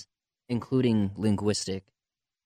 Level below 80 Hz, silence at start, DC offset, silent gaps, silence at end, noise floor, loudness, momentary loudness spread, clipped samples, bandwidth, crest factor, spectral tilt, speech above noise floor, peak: -62 dBFS; 0 s; under 0.1%; none; 0.65 s; under -90 dBFS; -28 LUFS; 9 LU; under 0.1%; 11 kHz; 16 dB; -6 dB/octave; over 63 dB; -14 dBFS